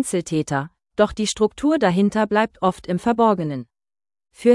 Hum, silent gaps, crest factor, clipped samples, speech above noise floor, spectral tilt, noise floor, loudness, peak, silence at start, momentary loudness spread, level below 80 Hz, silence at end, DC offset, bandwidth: none; none; 16 dB; under 0.1%; over 70 dB; -5.5 dB/octave; under -90 dBFS; -21 LUFS; -4 dBFS; 0 s; 8 LU; -50 dBFS; 0 s; under 0.1%; 12 kHz